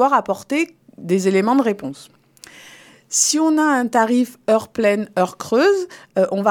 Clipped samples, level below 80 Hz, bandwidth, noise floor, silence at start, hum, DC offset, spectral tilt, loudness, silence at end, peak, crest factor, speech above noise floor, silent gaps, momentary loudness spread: under 0.1%; -66 dBFS; 18 kHz; -45 dBFS; 0 s; none; under 0.1%; -4 dB/octave; -18 LUFS; 0 s; -2 dBFS; 16 dB; 27 dB; none; 8 LU